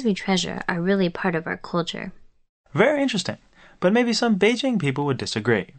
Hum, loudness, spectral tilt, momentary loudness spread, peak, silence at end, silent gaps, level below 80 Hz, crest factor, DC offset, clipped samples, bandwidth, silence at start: none; -22 LUFS; -5 dB/octave; 11 LU; -2 dBFS; 0.15 s; 2.49-2.64 s; -56 dBFS; 20 dB; under 0.1%; under 0.1%; 8.8 kHz; 0 s